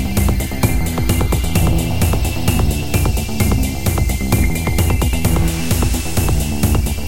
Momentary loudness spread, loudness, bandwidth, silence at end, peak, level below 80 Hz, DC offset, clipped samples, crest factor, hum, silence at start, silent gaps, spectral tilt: 2 LU; -17 LUFS; 17.5 kHz; 0 s; -2 dBFS; -20 dBFS; 4%; under 0.1%; 14 dB; none; 0 s; none; -5 dB/octave